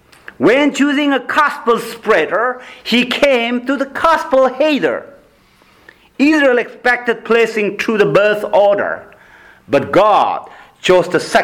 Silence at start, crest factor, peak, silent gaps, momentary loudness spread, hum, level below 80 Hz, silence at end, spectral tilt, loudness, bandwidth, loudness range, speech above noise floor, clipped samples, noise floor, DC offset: 0.4 s; 12 dB; -2 dBFS; none; 6 LU; none; -52 dBFS; 0 s; -4.5 dB/octave; -14 LUFS; 18 kHz; 2 LU; 36 dB; under 0.1%; -50 dBFS; under 0.1%